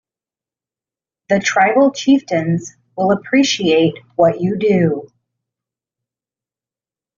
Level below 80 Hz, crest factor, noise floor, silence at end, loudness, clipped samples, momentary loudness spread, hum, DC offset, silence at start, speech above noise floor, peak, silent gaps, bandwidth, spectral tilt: -58 dBFS; 16 dB; under -90 dBFS; 2.15 s; -15 LUFS; under 0.1%; 7 LU; none; under 0.1%; 1.3 s; over 75 dB; 0 dBFS; none; 7.4 kHz; -4.5 dB/octave